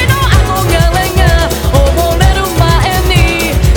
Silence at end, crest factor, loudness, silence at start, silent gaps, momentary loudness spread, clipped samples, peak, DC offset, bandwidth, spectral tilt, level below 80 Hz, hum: 0 s; 8 dB; -10 LUFS; 0 s; none; 2 LU; 0.4%; 0 dBFS; under 0.1%; 19.5 kHz; -5 dB/octave; -12 dBFS; none